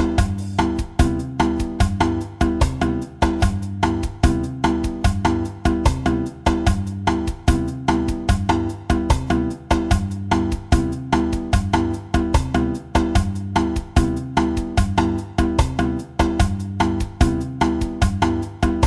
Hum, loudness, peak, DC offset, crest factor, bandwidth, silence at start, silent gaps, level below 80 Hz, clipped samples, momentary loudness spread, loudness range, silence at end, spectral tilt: none; -21 LUFS; -4 dBFS; under 0.1%; 16 dB; 12.5 kHz; 0 s; none; -26 dBFS; under 0.1%; 3 LU; 1 LU; 0 s; -6.5 dB/octave